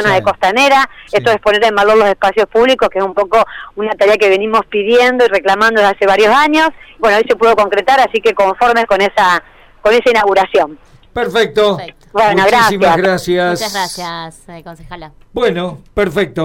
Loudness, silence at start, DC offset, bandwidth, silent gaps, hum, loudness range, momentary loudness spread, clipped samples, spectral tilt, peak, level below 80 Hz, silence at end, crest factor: -11 LUFS; 0 s; under 0.1%; 17 kHz; none; none; 3 LU; 11 LU; under 0.1%; -4 dB/octave; -2 dBFS; -42 dBFS; 0 s; 8 dB